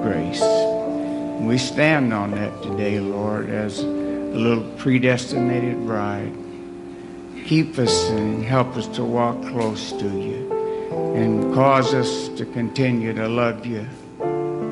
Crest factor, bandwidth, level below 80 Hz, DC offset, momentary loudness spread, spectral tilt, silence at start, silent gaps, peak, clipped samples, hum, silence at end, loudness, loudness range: 20 dB; 11.5 kHz; -54 dBFS; under 0.1%; 11 LU; -6 dB/octave; 0 s; none; -2 dBFS; under 0.1%; none; 0 s; -22 LUFS; 2 LU